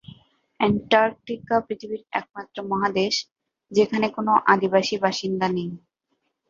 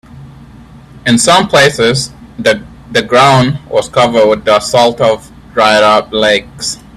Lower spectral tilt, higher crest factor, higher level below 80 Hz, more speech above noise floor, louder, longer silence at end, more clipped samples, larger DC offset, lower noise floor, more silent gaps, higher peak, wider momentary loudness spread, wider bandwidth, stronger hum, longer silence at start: about the same, -5 dB/octave vs -4 dB/octave; first, 20 dB vs 10 dB; second, -60 dBFS vs -40 dBFS; first, 52 dB vs 26 dB; second, -23 LUFS vs -10 LUFS; first, 0.75 s vs 0.2 s; second, under 0.1% vs 0.2%; neither; first, -75 dBFS vs -35 dBFS; neither; about the same, -2 dBFS vs 0 dBFS; first, 15 LU vs 11 LU; second, 7.6 kHz vs 14.5 kHz; neither; about the same, 0.1 s vs 0.15 s